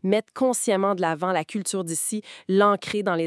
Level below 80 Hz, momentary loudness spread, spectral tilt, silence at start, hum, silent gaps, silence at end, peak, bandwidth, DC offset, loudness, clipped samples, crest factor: -74 dBFS; 7 LU; -4.5 dB/octave; 0.05 s; none; none; 0 s; -6 dBFS; 12 kHz; under 0.1%; -24 LUFS; under 0.1%; 18 dB